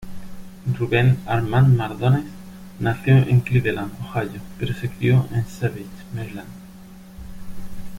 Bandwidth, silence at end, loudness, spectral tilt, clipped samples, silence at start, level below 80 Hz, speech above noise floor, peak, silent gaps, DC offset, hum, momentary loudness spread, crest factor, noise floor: 14.5 kHz; 0 s; -21 LUFS; -8 dB/octave; under 0.1%; 0 s; -44 dBFS; 22 dB; -4 dBFS; none; under 0.1%; none; 23 LU; 16 dB; -41 dBFS